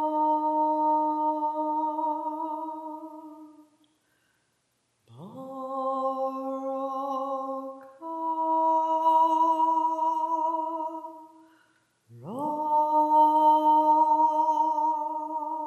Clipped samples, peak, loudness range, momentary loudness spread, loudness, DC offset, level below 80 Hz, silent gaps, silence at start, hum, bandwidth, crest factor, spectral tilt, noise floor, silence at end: under 0.1%; -12 dBFS; 13 LU; 18 LU; -25 LUFS; under 0.1%; under -90 dBFS; none; 0 s; none; 12.5 kHz; 16 dB; -6.5 dB/octave; -73 dBFS; 0 s